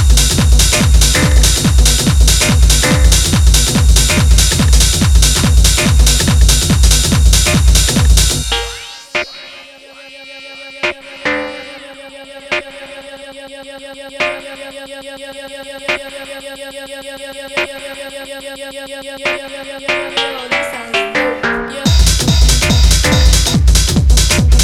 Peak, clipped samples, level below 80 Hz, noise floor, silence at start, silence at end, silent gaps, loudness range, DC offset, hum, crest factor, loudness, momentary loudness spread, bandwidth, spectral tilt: 0 dBFS; under 0.1%; -14 dBFS; -36 dBFS; 0 s; 0 s; none; 13 LU; under 0.1%; none; 12 dB; -11 LUFS; 20 LU; 16 kHz; -3.5 dB/octave